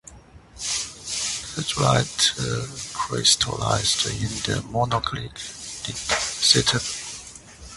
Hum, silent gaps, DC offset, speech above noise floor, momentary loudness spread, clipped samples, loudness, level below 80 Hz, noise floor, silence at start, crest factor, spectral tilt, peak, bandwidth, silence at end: none; none; under 0.1%; 24 dB; 14 LU; under 0.1%; -22 LUFS; -46 dBFS; -47 dBFS; 0.05 s; 24 dB; -2.5 dB/octave; -2 dBFS; 12 kHz; 0 s